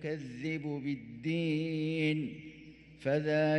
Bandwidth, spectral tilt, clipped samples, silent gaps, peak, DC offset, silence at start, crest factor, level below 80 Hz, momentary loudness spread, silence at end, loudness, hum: 9.2 kHz; -7.5 dB/octave; under 0.1%; none; -18 dBFS; under 0.1%; 0 s; 16 dB; -68 dBFS; 17 LU; 0 s; -34 LUFS; none